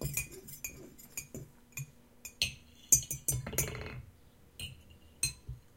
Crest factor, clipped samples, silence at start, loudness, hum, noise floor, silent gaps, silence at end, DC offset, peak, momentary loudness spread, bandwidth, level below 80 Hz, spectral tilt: 32 dB; under 0.1%; 0 s; -34 LUFS; none; -60 dBFS; none; 0.1 s; under 0.1%; -6 dBFS; 23 LU; 17 kHz; -54 dBFS; -1.5 dB/octave